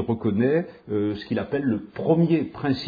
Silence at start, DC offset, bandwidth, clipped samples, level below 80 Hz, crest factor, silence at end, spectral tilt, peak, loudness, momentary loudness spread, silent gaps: 0 s; under 0.1%; 5 kHz; under 0.1%; -56 dBFS; 16 dB; 0 s; -9.5 dB/octave; -6 dBFS; -24 LUFS; 7 LU; none